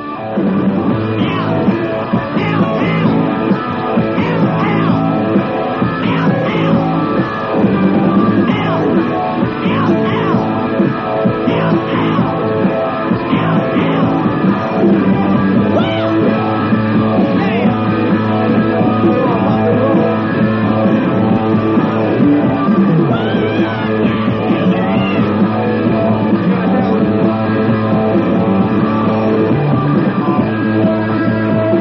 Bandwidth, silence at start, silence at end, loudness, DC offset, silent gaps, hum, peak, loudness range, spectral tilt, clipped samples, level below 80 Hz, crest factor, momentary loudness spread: 5.8 kHz; 0 s; 0 s; -13 LUFS; under 0.1%; none; none; 0 dBFS; 2 LU; -6.5 dB/octave; under 0.1%; -44 dBFS; 12 dB; 3 LU